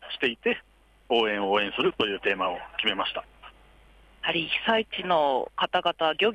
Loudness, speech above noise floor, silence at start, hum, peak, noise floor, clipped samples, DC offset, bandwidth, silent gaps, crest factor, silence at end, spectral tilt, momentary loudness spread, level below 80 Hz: -26 LUFS; 29 dB; 0 s; none; -10 dBFS; -55 dBFS; under 0.1%; under 0.1%; 10.5 kHz; none; 18 dB; 0 s; -5 dB/octave; 5 LU; -58 dBFS